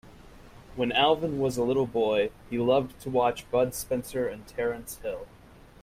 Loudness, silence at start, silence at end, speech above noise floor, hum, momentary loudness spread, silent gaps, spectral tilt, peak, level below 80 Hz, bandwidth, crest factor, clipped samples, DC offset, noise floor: -28 LUFS; 0.05 s; 0.55 s; 22 dB; none; 12 LU; none; -5 dB/octave; -10 dBFS; -54 dBFS; 16 kHz; 18 dB; under 0.1%; under 0.1%; -49 dBFS